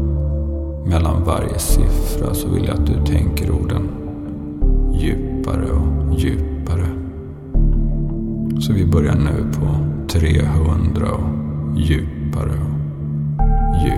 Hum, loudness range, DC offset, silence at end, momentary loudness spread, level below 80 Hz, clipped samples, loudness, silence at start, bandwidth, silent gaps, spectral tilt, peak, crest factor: none; 3 LU; under 0.1%; 0 s; 7 LU; -20 dBFS; under 0.1%; -19 LUFS; 0 s; 15 kHz; none; -7 dB/octave; 0 dBFS; 16 dB